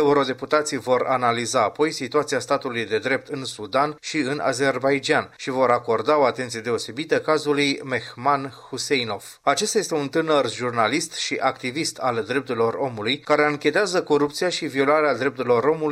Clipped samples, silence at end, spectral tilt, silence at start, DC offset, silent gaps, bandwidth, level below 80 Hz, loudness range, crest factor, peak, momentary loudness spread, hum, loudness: under 0.1%; 0 s; -4 dB/octave; 0 s; under 0.1%; none; 15 kHz; -66 dBFS; 2 LU; 18 dB; -4 dBFS; 6 LU; none; -22 LUFS